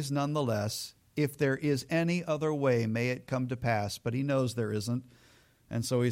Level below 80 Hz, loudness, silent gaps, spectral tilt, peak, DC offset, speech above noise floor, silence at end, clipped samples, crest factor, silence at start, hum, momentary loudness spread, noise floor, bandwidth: -64 dBFS; -31 LUFS; none; -6 dB/octave; -16 dBFS; under 0.1%; 32 dB; 0 s; under 0.1%; 14 dB; 0 s; none; 7 LU; -62 dBFS; 16.5 kHz